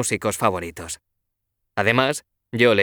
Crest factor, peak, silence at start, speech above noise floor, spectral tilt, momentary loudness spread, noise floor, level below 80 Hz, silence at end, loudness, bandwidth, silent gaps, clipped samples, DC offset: 20 dB; -4 dBFS; 0 s; 57 dB; -4 dB/octave; 15 LU; -77 dBFS; -56 dBFS; 0 s; -22 LUFS; over 20 kHz; none; under 0.1%; under 0.1%